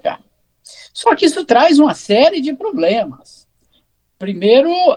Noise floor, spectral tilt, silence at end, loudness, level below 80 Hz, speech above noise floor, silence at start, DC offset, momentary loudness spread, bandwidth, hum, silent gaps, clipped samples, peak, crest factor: -61 dBFS; -4.5 dB/octave; 0 s; -13 LUFS; -60 dBFS; 48 dB; 0.05 s; under 0.1%; 16 LU; 11.5 kHz; none; none; under 0.1%; 0 dBFS; 14 dB